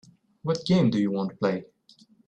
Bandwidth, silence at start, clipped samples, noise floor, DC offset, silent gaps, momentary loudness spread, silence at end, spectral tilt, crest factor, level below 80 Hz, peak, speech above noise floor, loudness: 9 kHz; 0.45 s; under 0.1%; -58 dBFS; under 0.1%; none; 11 LU; 0.65 s; -7 dB/octave; 16 dB; -60 dBFS; -10 dBFS; 34 dB; -26 LUFS